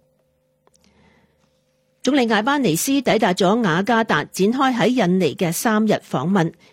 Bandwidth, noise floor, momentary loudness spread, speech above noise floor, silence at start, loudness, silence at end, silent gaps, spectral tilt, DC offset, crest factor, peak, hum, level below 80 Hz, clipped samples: 16.5 kHz; -65 dBFS; 4 LU; 47 dB; 2.05 s; -18 LUFS; 0.2 s; none; -5 dB/octave; under 0.1%; 14 dB; -4 dBFS; none; -60 dBFS; under 0.1%